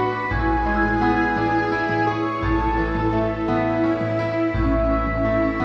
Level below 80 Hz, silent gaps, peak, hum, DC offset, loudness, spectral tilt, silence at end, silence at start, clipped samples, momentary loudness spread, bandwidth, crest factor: -30 dBFS; none; -8 dBFS; none; under 0.1%; -21 LUFS; -8 dB/octave; 0 s; 0 s; under 0.1%; 3 LU; 6.6 kHz; 12 dB